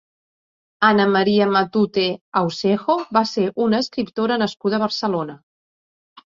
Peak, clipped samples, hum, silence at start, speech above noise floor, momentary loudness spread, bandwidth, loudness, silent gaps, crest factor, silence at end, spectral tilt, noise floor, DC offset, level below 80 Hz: -2 dBFS; under 0.1%; none; 0.8 s; over 71 dB; 6 LU; 7.6 kHz; -19 LUFS; 2.21-2.32 s; 18 dB; 0.95 s; -6 dB/octave; under -90 dBFS; under 0.1%; -62 dBFS